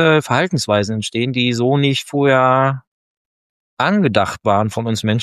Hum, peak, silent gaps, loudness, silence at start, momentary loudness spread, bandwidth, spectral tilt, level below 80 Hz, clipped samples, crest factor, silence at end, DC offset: none; 0 dBFS; 2.87-3.77 s; -16 LUFS; 0 s; 6 LU; 13.5 kHz; -5.5 dB/octave; -56 dBFS; under 0.1%; 16 dB; 0 s; under 0.1%